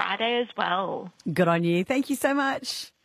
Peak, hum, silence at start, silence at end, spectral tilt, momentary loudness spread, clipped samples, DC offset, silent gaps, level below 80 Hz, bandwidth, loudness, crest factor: -6 dBFS; none; 0 s; 0.15 s; -5 dB/octave; 9 LU; under 0.1%; under 0.1%; none; -68 dBFS; 15 kHz; -26 LUFS; 18 dB